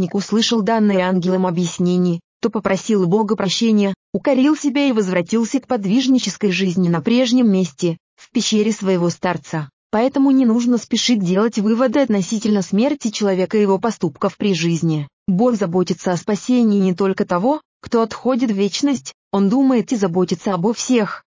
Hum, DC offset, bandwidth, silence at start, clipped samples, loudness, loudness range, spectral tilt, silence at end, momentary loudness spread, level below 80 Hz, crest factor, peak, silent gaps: none; under 0.1%; 7.6 kHz; 0 s; under 0.1%; -18 LUFS; 2 LU; -5.5 dB/octave; 0.1 s; 6 LU; -60 dBFS; 12 dB; -6 dBFS; 2.24-2.40 s, 3.96-4.13 s, 8.00-8.17 s, 9.73-9.90 s, 15.13-15.26 s, 17.65-17.80 s, 19.14-19.31 s